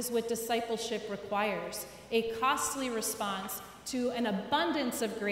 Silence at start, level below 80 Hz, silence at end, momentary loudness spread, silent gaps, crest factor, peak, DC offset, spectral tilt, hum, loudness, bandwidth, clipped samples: 0 s; -66 dBFS; 0 s; 8 LU; none; 18 dB; -16 dBFS; under 0.1%; -3 dB/octave; none; -33 LUFS; 16 kHz; under 0.1%